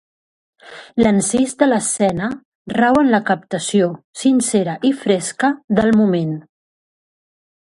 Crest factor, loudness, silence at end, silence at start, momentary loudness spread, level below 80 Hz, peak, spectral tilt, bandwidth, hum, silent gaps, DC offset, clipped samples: 18 dB; -17 LUFS; 1.3 s; 0.65 s; 10 LU; -52 dBFS; 0 dBFS; -5 dB/octave; 11.5 kHz; none; 2.45-2.65 s, 4.04-4.14 s, 5.64-5.68 s; under 0.1%; under 0.1%